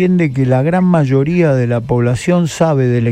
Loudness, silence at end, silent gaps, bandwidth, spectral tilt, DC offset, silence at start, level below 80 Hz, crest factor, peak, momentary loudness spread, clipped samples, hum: -13 LUFS; 0 s; none; 10 kHz; -7.5 dB/octave; under 0.1%; 0 s; -42 dBFS; 12 dB; 0 dBFS; 3 LU; under 0.1%; none